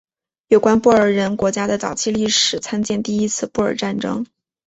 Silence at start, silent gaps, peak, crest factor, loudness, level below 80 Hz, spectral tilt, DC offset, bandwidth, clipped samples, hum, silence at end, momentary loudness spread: 0.5 s; none; -2 dBFS; 18 dB; -18 LUFS; -52 dBFS; -3.5 dB/octave; under 0.1%; 8.2 kHz; under 0.1%; none; 0.4 s; 9 LU